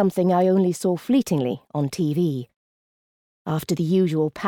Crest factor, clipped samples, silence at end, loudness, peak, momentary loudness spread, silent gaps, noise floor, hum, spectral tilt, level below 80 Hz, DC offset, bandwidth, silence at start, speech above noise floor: 14 dB; under 0.1%; 0 s; -22 LUFS; -8 dBFS; 9 LU; 2.56-3.45 s; under -90 dBFS; none; -7 dB/octave; -62 dBFS; under 0.1%; 17.5 kHz; 0 s; over 69 dB